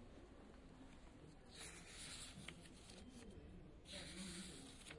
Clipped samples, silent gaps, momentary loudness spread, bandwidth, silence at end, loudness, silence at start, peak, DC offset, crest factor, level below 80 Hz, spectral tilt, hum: under 0.1%; none; 11 LU; 11.5 kHz; 0 s; -57 LUFS; 0 s; -36 dBFS; under 0.1%; 20 dB; -66 dBFS; -3 dB/octave; none